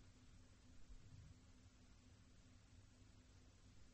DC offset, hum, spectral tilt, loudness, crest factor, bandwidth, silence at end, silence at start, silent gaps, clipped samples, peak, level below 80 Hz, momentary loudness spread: under 0.1%; none; -5 dB/octave; -68 LUFS; 14 dB; 8.2 kHz; 0 s; 0 s; none; under 0.1%; -50 dBFS; -70 dBFS; 4 LU